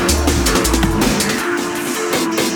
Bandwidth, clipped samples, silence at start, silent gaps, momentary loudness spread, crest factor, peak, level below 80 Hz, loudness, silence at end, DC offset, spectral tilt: over 20 kHz; under 0.1%; 0 s; none; 5 LU; 14 dB; -2 dBFS; -24 dBFS; -16 LUFS; 0 s; under 0.1%; -3.5 dB/octave